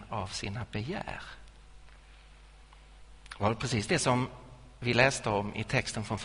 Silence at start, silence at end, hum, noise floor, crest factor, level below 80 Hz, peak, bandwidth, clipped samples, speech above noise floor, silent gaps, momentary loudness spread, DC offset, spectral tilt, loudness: 0 s; 0 s; none; -54 dBFS; 24 dB; -52 dBFS; -10 dBFS; 10.5 kHz; under 0.1%; 23 dB; none; 18 LU; under 0.1%; -4.5 dB/octave; -31 LUFS